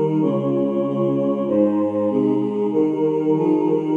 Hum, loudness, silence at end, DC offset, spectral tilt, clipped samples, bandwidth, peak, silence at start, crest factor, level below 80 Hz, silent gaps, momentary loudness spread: none; -20 LUFS; 0 s; under 0.1%; -10 dB/octave; under 0.1%; 3.5 kHz; -6 dBFS; 0 s; 14 dB; -80 dBFS; none; 3 LU